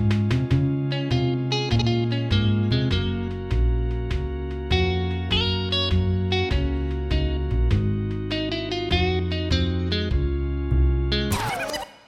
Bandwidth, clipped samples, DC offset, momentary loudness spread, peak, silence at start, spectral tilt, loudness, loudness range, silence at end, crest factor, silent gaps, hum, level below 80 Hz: 14 kHz; under 0.1%; under 0.1%; 5 LU; -6 dBFS; 0 s; -6.5 dB/octave; -24 LUFS; 1 LU; 0.15 s; 16 dB; none; none; -28 dBFS